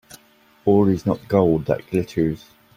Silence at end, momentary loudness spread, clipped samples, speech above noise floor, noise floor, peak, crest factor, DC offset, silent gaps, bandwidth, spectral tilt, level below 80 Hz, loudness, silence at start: 0.4 s; 7 LU; under 0.1%; 36 dB; -55 dBFS; -2 dBFS; 18 dB; under 0.1%; none; 16 kHz; -8.5 dB/octave; -48 dBFS; -20 LUFS; 0.65 s